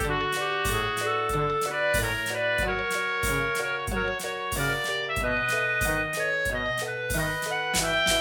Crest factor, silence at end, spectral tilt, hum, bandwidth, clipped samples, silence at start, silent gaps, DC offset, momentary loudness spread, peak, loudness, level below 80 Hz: 16 dB; 0 s; -3 dB/octave; none; 19.5 kHz; under 0.1%; 0 s; none; under 0.1%; 4 LU; -10 dBFS; -26 LUFS; -40 dBFS